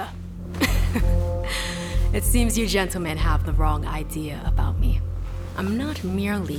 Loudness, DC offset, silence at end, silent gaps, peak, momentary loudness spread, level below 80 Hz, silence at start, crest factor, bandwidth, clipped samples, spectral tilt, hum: -25 LUFS; under 0.1%; 0 s; none; -6 dBFS; 9 LU; -26 dBFS; 0 s; 16 dB; 16.5 kHz; under 0.1%; -5 dB/octave; none